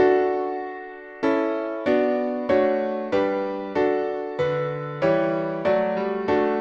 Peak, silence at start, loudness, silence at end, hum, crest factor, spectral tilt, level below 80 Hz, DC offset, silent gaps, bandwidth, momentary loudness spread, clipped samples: -6 dBFS; 0 s; -23 LUFS; 0 s; none; 16 dB; -7.5 dB/octave; -60 dBFS; under 0.1%; none; 7 kHz; 6 LU; under 0.1%